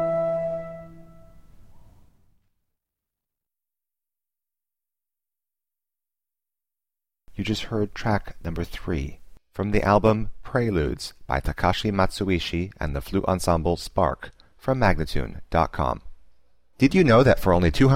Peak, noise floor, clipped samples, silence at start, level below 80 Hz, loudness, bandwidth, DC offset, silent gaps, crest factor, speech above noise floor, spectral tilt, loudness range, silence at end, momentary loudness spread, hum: -6 dBFS; under -90 dBFS; under 0.1%; 0 s; -36 dBFS; -24 LUFS; 16 kHz; under 0.1%; none; 20 dB; over 68 dB; -6.5 dB/octave; 11 LU; 0 s; 14 LU; none